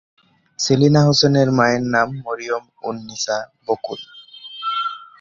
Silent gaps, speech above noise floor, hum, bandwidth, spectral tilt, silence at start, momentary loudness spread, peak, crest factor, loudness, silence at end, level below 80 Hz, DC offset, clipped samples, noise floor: none; 20 dB; none; 7.6 kHz; -5 dB/octave; 0.6 s; 16 LU; -2 dBFS; 18 dB; -19 LUFS; 0.15 s; -54 dBFS; under 0.1%; under 0.1%; -38 dBFS